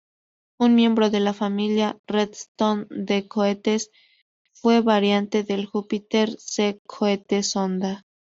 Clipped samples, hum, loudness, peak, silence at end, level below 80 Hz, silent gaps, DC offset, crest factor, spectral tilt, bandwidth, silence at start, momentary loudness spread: under 0.1%; none; -23 LUFS; -6 dBFS; 0.4 s; -66 dBFS; 1.99-2.04 s, 2.48-2.55 s, 4.22-4.45 s, 6.79-6.85 s; under 0.1%; 16 dB; -4.5 dB/octave; 8 kHz; 0.6 s; 9 LU